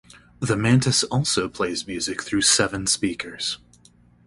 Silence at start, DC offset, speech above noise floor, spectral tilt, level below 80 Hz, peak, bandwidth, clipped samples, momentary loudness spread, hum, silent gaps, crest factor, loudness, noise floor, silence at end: 0.4 s; under 0.1%; 32 dB; -3.5 dB/octave; -50 dBFS; -4 dBFS; 11.5 kHz; under 0.1%; 10 LU; none; none; 20 dB; -22 LUFS; -55 dBFS; 0.7 s